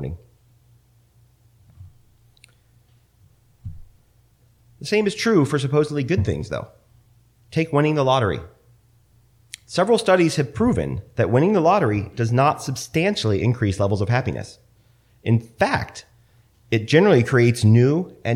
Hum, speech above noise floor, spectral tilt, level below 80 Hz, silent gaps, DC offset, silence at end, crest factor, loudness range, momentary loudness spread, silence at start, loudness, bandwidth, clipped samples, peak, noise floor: none; 38 dB; -6.5 dB/octave; -48 dBFS; none; under 0.1%; 0 s; 20 dB; 5 LU; 18 LU; 0 s; -20 LUFS; 14 kHz; under 0.1%; -2 dBFS; -57 dBFS